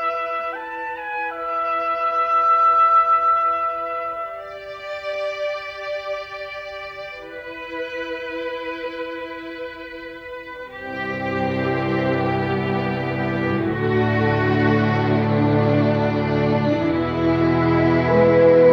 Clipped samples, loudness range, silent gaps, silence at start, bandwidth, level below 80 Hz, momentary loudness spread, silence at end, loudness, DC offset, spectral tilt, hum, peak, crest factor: under 0.1%; 11 LU; none; 0 s; 7 kHz; -46 dBFS; 17 LU; 0 s; -20 LUFS; under 0.1%; -8.5 dB/octave; none; -4 dBFS; 16 dB